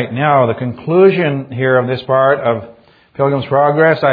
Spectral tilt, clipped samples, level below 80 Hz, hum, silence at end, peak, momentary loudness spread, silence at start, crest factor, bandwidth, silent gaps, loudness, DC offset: -10 dB/octave; under 0.1%; -56 dBFS; none; 0 s; 0 dBFS; 7 LU; 0 s; 14 dB; 5 kHz; none; -13 LUFS; under 0.1%